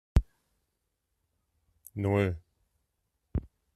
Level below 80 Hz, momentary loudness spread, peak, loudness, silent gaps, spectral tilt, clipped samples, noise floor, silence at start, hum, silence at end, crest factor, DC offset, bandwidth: -38 dBFS; 16 LU; -8 dBFS; -32 LUFS; none; -8 dB/octave; under 0.1%; -81 dBFS; 0.15 s; none; 0.35 s; 26 dB; under 0.1%; 13.5 kHz